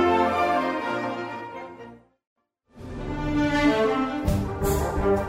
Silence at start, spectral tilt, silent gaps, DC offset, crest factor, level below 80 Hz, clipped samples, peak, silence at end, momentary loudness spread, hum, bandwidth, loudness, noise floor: 0 s; -6 dB/octave; 2.27-2.36 s; under 0.1%; 16 dB; -38 dBFS; under 0.1%; -10 dBFS; 0 s; 17 LU; none; 16 kHz; -25 LUFS; -47 dBFS